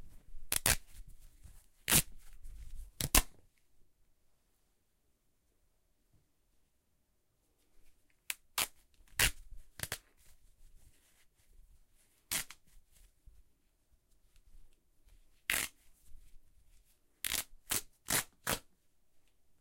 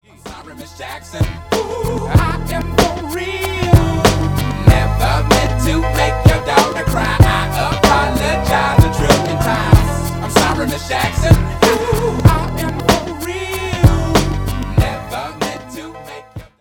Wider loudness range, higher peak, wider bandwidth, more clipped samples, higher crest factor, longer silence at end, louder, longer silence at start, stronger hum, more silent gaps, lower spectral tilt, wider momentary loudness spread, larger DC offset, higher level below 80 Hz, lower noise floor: first, 12 LU vs 5 LU; second, -6 dBFS vs 0 dBFS; second, 17 kHz vs 19 kHz; second, under 0.1% vs 0.1%; first, 36 dB vs 14 dB; first, 0.4 s vs 0.15 s; second, -34 LUFS vs -15 LUFS; second, 0 s vs 0.25 s; neither; neither; second, -1 dB/octave vs -5.5 dB/octave; first, 20 LU vs 13 LU; neither; second, -52 dBFS vs -22 dBFS; first, -78 dBFS vs -34 dBFS